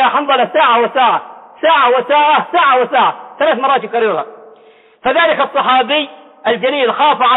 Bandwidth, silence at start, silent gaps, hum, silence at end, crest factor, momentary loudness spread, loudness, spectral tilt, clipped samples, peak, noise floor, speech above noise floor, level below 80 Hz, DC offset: 4.1 kHz; 0 s; none; none; 0 s; 10 dB; 7 LU; -12 LUFS; -7 dB/octave; under 0.1%; -2 dBFS; -45 dBFS; 33 dB; -64 dBFS; under 0.1%